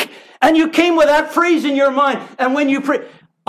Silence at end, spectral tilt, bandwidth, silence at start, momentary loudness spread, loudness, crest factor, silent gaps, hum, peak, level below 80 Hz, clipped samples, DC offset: 0.4 s; -3.5 dB/octave; 15.5 kHz; 0 s; 7 LU; -15 LUFS; 14 dB; none; none; 0 dBFS; -56 dBFS; under 0.1%; under 0.1%